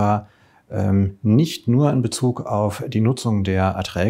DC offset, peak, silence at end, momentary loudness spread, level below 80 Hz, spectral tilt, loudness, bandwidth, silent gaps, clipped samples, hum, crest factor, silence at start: under 0.1%; -4 dBFS; 0 s; 5 LU; -50 dBFS; -7 dB/octave; -20 LUFS; 16 kHz; none; under 0.1%; none; 16 dB; 0 s